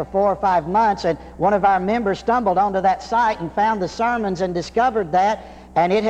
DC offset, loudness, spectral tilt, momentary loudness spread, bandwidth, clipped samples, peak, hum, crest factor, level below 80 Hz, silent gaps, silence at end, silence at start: under 0.1%; -19 LUFS; -6 dB/octave; 5 LU; 9 kHz; under 0.1%; -6 dBFS; none; 14 dB; -44 dBFS; none; 0 s; 0 s